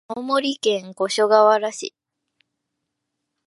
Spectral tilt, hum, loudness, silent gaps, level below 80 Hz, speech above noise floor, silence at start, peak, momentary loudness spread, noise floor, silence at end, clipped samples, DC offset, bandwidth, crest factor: -3 dB/octave; none; -19 LUFS; none; -78 dBFS; 60 dB; 0.1 s; -2 dBFS; 14 LU; -79 dBFS; 1.6 s; under 0.1%; under 0.1%; 11.5 kHz; 20 dB